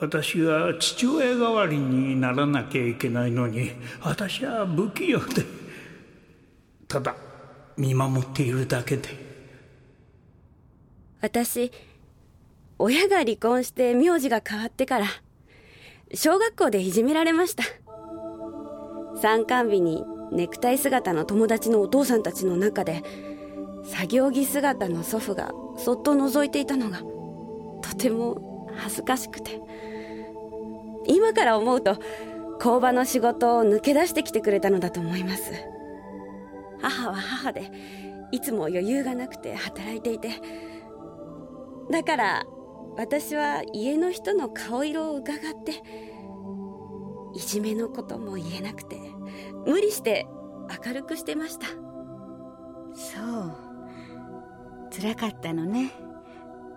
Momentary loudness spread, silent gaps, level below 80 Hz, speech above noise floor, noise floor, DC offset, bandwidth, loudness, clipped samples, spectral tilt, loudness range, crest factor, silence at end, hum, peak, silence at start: 20 LU; none; -60 dBFS; 32 dB; -56 dBFS; under 0.1%; 18 kHz; -25 LUFS; under 0.1%; -5 dB/octave; 10 LU; 20 dB; 0 s; none; -8 dBFS; 0 s